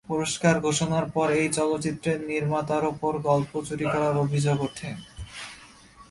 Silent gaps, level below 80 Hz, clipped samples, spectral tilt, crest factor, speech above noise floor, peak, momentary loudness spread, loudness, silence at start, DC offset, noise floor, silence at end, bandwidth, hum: none; -54 dBFS; under 0.1%; -5.5 dB/octave; 20 dB; 25 dB; -6 dBFS; 15 LU; -25 LUFS; 0.1 s; under 0.1%; -50 dBFS; 0.1 s; 11.5 kHz; none